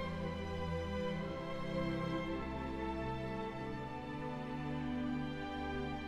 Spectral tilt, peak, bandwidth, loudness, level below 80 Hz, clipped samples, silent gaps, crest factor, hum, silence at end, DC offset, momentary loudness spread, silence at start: -7 dB/octave; -26 dBFS; 13 kHz; -41 LUFS; -52 dBFS; under 0.1%; none; 14 dB; none; 0 s; under 0.1%; 4 LU; 0 s